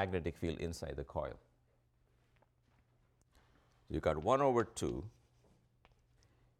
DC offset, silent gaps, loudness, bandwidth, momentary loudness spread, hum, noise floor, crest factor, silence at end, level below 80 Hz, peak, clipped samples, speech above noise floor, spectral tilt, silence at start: under 0.1%; none; -37 LUFS; 15 kHz; 13 LU; none; -74 dBFS; 22 dB; 1.5 s; -56 dBFS; -18 dBFS; under 0.1%; 37 dB; -6 dB/octave; 0 s